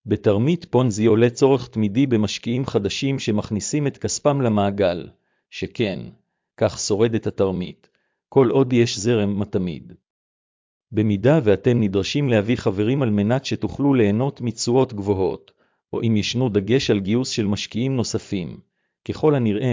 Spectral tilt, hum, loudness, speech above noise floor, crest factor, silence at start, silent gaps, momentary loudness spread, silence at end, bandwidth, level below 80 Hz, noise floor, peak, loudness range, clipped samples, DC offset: -6 dB/octave; none; -21 LUFS; over 70 dB; 16 dB; 0.05 s; 10.10-10.81 s; 10 LU; 0 s; 7.6 kHz; -48 dBFS; under -90 dBFS; -4 dBFS; 3 LU; under 0.1%; under 0.1%